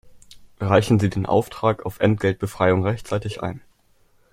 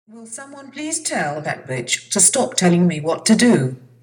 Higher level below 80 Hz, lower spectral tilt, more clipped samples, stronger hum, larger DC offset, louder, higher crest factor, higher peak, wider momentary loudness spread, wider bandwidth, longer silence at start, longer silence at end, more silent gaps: first, -50 dBFS vs -66 dBFS; first, -7 dB/octave vs -4 dB/octave; neither; neither; neither; second, -22 LUFS vs -17 LUFS; first, 22 dB vs 16 dB; about the same, 0 dBFS vs -2 dBFS; second, 11 LU vs 20 LU; second, 15.5 kHz vs 18 kHz; about the same, 0.05 s vs 0.15 s; first, 0.75 s vs 0.25 s; neither